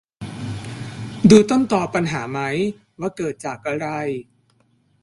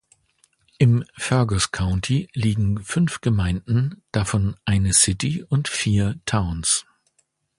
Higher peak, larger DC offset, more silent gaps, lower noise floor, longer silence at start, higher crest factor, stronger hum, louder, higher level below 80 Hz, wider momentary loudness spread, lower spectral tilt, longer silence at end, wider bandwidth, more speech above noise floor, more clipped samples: about the same, 0 dBFS vs -2 dBFS; neither; neither; second, -61 dBFS vs -68 dBFS; second, 0.2 s vs 0.8 s; about the same, 20 dB vs 18 dB; neither; about the same, -20 LUFS vs -21 LUFS; second, -52 dBFS vs -38 dBFS; first, 19 LU vs 6 LU; first, -6 dB/octave vs -4.5 dB/octave; about the same, 0.8 s vs 0.75 s; about the same, 11.5 kHz vs 11.5 kHz; second, 43 dB vs 47 dB; neither